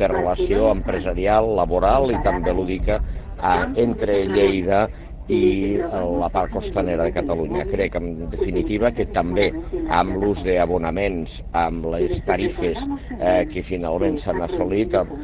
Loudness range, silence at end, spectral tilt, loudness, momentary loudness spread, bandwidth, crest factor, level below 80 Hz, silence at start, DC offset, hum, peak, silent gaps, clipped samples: 3 LU; 0 s; -11 dB/octave; -21 LUFS; 7 LU; 4 kHz; 18 dB; -32 dBFS; 0 s; under 0.1%; none; -2 dBFS; none; under 0.1%